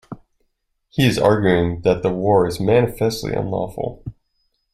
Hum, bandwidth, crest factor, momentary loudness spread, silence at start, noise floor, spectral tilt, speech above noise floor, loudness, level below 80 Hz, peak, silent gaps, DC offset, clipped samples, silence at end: none; 16 kHz; 18 dB; 16 LU; 0.1 s; -69 dBFS; -6.5 dB/octave; 51 dB; -19 LUFS; -44 dBFS; -2 dBFS; none; under 0.1%; under 0.1%; 0.6 s